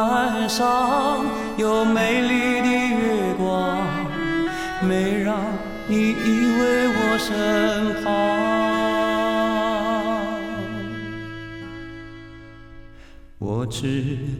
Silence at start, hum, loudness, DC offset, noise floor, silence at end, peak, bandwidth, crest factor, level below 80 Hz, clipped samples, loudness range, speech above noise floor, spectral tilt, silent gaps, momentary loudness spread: 0 s; none; -21 LUFS; under 0.1%; -43 dBFS; 0 s; -6 dBFS; 16.5 kHz; 16 dB; -44 dBFS; under 0.1%; 10 LU; 22 dB; -5 dB/octave; none; 13 LU